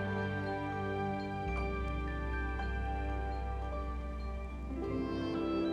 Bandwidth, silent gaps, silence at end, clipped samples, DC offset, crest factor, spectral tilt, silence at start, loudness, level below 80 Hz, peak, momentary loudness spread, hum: 7.6 kHz; none; 0 s; under 0.1%; under 0.1%; 12 dB; -8 dB/octave; 0 s; -38 LUFS; -40 dBFS; -24 dBFS; 5 LU; none